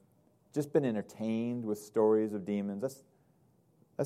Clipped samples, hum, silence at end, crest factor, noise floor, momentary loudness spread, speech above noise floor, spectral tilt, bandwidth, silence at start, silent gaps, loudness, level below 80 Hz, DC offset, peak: under 0.1%; none; 0 s; 20 dB; -68 dBFS; 11 LU; 36 dB; -7.5 dB/octave; 15 kHz; 0.55 s; none; -33 LUFS; -82 dBFS; under 0.1%; -14 dBFS